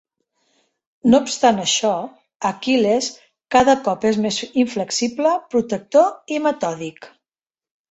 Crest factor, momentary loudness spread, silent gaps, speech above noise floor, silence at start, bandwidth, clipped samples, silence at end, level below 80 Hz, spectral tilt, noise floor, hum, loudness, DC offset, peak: 18 dB; 10 LU; 2.36-2.40 s; over 72 dB; 1.05 s; 8.2 kHz; under 0.1%; 0.85 s; -58 dBFS; -3.5 dB/octave; under -90 dBFS; none; -19 LUFS; under 0.1%; -2 dBFS